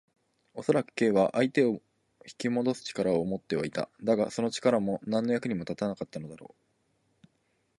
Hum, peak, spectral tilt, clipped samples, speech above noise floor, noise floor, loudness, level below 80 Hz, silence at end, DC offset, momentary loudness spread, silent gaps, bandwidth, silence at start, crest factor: none; -10 dBFS; -6 dB/octave; under 0.1%; 45 dB; -74 dBFS; -29 LUFS; -66 dBFS; 1.35 s; under 0.1%; 11 LU; none; 11.5 kHz; 0.55 s; 20 dB